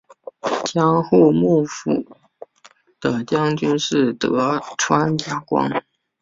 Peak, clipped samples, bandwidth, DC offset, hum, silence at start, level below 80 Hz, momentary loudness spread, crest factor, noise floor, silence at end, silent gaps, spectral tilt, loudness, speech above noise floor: -2 dBFS; under 0.1%; 7.8 kHz; under 0.1%; none; 0.45 s; -58 dBFS; 10 LU; 18 dB; -52 dBFS; 0.4 s; none; -5.5 dB/octave; -19 LUFS; 34 dB